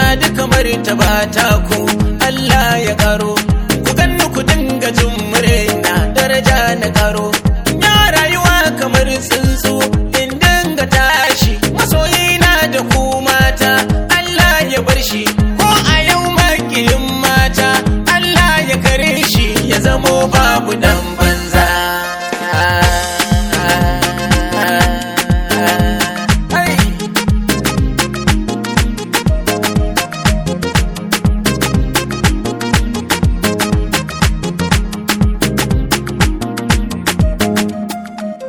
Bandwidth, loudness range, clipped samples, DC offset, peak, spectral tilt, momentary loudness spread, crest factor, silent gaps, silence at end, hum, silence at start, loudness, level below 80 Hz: over 20 kHz; 4 LU; 0.1%; under 0.1%; 0 dBFS; -4 dB/octave; 6 LU; 12 dB; none; 0 s; none; 0 s; -12 LUFS; -20 dBFS